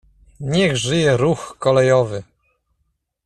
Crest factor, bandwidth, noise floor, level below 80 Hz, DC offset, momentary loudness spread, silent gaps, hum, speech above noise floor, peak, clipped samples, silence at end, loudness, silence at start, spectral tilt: 16 dB; 11.5 kHz; -70 dBFS; -48 dBFS; under 0.1%; 10 LU; none; none; 54 dB; -4 dBFS; under 0.1%; 1.05 s; -17 LUFS; 0.4 s; -5.5 dB/octave